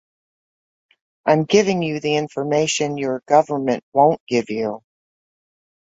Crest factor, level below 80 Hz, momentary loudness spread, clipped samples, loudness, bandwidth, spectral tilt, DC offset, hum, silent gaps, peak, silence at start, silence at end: 18 dB; -64 dBFS; 9 LU; under 0.1%; -19 LUFS; 8.4 kHz; -5 dB/octave; under 0.1%; none; 3.83-3.92 s, 4.20-4.27 s; -2 dBFS; 1.25 s; 1.1 s